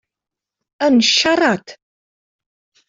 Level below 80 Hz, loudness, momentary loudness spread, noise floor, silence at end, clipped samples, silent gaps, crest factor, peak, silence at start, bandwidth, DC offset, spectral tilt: -62 dBFS; -15 LUFS; 8 LU; -86 dBFS; 1.15 s; under 0.1%; none; 16 dB; -2 dBFS; 0.8 s; 7.8 kHz; under 0.1%; -2.5 dB/octave